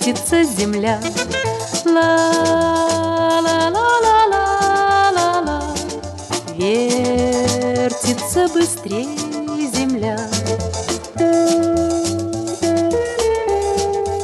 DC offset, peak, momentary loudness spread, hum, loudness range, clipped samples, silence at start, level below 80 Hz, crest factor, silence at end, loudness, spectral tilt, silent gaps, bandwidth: under 0.1%; -4 dBFS; 9 LU; none; 4 LU; under 0.1%; 0 s; -40 dBFS; 14 dB; 0 s; -17 LUFS; -4 dB/octave; none; 13 kHz